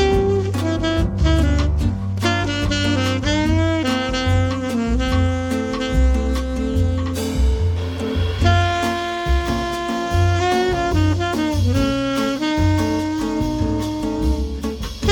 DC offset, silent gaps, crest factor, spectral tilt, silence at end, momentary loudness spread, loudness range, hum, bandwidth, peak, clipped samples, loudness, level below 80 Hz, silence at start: under 0.1%; none; 16 dB; -6 dB/octave; 0 s; 5 LU; 1 LU; none; 17 kHz; -2 dBFS; under 0.1%; -20 LUFS; -24 dBFS; 0 s